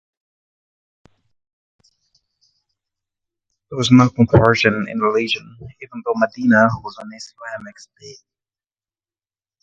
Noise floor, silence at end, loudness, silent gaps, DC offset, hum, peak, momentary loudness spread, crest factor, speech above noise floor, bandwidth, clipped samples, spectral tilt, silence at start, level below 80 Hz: under -90 dBFS; 1.5 s; -16 LUFS; none; under 0.1%; none; 0 dBFS; 21 LU; 20 dB; over 73 dB; 7.8 kHz; under 0.1%; -6 dB/octave; 3.7 s; -46 dBFS